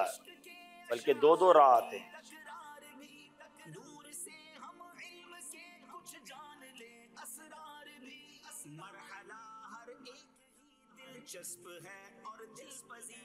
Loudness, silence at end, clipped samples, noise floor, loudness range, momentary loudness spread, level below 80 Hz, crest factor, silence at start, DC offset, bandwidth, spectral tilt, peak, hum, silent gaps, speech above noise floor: -29 LUFS; 0.15 s; under 0.1%; -68 dBFS; 21 LU; 26 LU; -88 dBFS; 24 dB; 0 s; under 0.1%; 16 kHz; -3 dB/octave; -12 dBFS; none; none; 37 dB